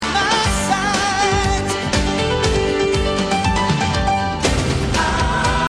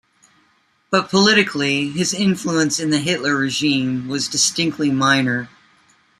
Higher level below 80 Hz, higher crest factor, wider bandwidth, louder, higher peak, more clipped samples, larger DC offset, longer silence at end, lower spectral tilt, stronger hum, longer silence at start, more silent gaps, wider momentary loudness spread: first, -28 dBFS vs -60 dBFS; about the same, 14 dB vs 18 dB; about the same, 13.5 kHz vs 14.5 kHz; about the same, -17 LUFS vs -18 LUFS; about the same, -2 dBFS vs -2 dBFS; neither; neither; second, 0 s vs 0.75 s; about the same, -4 dB/octave vs -3.5 dB/octave; neither; second, 0 s vs 0.9 s; neither; second, 2 LU vs 7 LU